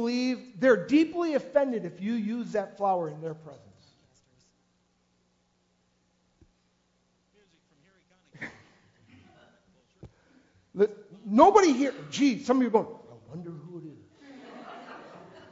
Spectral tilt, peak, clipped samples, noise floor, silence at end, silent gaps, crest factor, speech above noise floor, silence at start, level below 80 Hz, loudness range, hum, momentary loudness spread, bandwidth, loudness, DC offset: -5.5 dB/octave; -4 dBFS; under 0.1%; -71 dBFS; 0.35 s; none; 26 dB; 46 dB; 0 s; -68 dBFS; 12 LU; 60 Hz at -75 dBFS; 24 LU; 7.8 kHz; -26 LUFS; under 0.1%